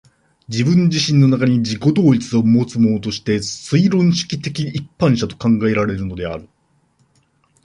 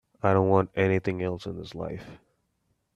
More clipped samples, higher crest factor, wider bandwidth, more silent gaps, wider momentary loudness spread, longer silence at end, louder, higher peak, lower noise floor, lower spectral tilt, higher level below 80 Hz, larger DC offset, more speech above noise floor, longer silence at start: neither; second, 14 dB vs 22 dB; first, 11 kHz vs 7.4 kHz; neither; second, 10 LU vs 15 LU; first, 1.2 s vs 0.8 s; first, -17 LUFS vs -26 LUFS; first, -2 dBFS vs -6 dBFS; second, -60 dBFS vs -74 dBFS; second, -6.5 dB/octave vs -8.5 dB/octave; first, -46 dBFS vs -58 dBFS; neither; second, 44 dB vs 48 dB; first, 0.5 s vs 0.25 s